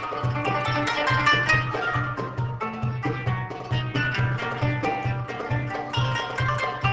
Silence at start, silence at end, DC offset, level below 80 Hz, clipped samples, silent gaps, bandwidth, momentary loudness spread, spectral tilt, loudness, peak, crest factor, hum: 0 s; 0 s; under 0.1%; -46 dBFS; under 0.1%; none; 8 kHz; 9 LU; -5.5 dB/octave; -25 LUFS; -6 dBFS; 18 dB; none